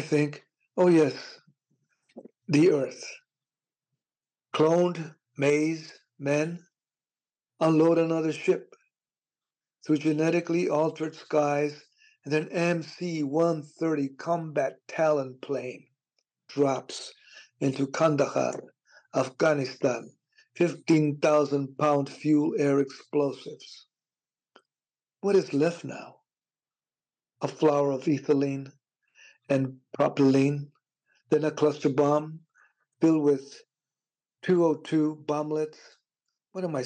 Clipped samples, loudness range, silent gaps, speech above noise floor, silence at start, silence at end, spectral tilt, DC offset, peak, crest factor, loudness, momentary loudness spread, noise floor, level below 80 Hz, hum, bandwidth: under 0.1%; 4 LU; none; over 64 dB; 0 s; 0 s; -6.5 dB/octave; under 0.1%; -14 dBFS; 14 dB; -27 LUFS; 16 LU; under -90 dBFS; -84 dBFS; none; 9.4 kHz